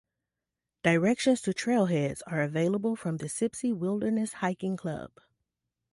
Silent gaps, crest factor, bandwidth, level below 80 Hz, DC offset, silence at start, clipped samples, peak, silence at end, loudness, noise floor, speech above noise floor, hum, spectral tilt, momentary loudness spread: none; 20 dB; 11.5 kHz; -66 dBFS; under 0.1%; 0.85 s; under 0.1%; -10 dBFS; 0.85 s; -29 LUFS; -88 dBFS; 60 dB; none; -5.5 dB/octave; 8 LU